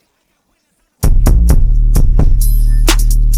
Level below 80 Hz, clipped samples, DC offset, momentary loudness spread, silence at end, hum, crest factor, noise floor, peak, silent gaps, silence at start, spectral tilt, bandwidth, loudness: -10 dBFS; under 0.1%; under 0.1%; 2 LU; 0 s; none; 8 dB; -61 dBFS; 0 dBFS; none; 1 s; -5 dB/octave; 15.5 kHz; -13 LUFS